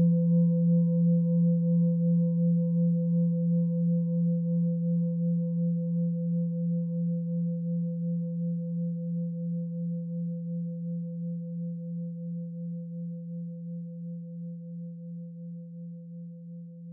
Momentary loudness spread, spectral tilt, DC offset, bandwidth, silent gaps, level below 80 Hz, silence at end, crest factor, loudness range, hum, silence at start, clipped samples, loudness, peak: 16 LU; -17 dB/octave; under 0.1%; 1 kHz; none; under -90 dBFS; 0 s; 12 dB; 13 LU; none; 0 s; under 0.1%; -29 LUFS; -16 dBFS